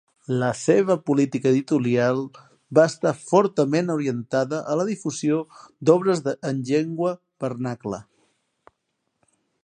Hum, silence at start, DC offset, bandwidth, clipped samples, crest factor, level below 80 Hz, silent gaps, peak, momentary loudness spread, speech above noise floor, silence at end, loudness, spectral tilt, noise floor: none; 0.3 s; under 0.1%; 10 kHz; under 0.1%; 20 dB; -68 dBFS; none; -2 dBFS; 10 LU; 54 dB; 1.6 s; -23 LUFS; -6.5 dB/octave; -76 dBFS